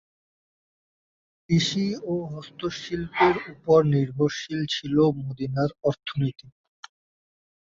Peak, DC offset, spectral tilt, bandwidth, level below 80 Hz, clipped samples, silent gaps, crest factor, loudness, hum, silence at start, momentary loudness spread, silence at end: -6 dBFS; under 0.1%; -6 dB/octave; 7.6 kHz; -58 dBFS; under 0.1%; none; 20 dB; -25 LUFS; none; 1.5 s; 11 LU; 1.25 s